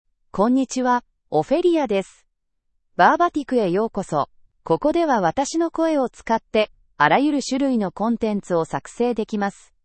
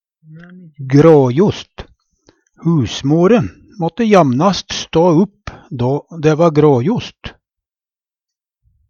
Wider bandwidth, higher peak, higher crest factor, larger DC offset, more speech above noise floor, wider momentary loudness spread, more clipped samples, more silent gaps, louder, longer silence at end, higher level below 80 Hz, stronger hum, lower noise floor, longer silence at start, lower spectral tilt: first, 8.8 kHz vs 7.2 kHz; about the same, 0 dBFS vs 0 dBFS; first, 20 dB vs 14 dB; neither; second, 51 dB vs over 77 dB; second, 8 LU vs 19 LU; neither; neither; second, -21 LUFS vs -13 LUFS; second, 0.35 s vs 1.6 s; second, -54 dBFS vs -44 dBFS; neither; second, -71 dBFS vs under -90 dBFS; about the same, 0.35 s vs 0.3 s; second, -5 dB/octave vs -7 dB/octave